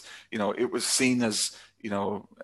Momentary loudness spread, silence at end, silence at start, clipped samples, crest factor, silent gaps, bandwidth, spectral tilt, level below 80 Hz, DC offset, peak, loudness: 11 LU; 0 s; 0 s; under 0.1%; 18 dB; none; 13 kHz; -3 dB/octave; -66 dBFS; under 0.1%; -10 dBFS; -27 LUFS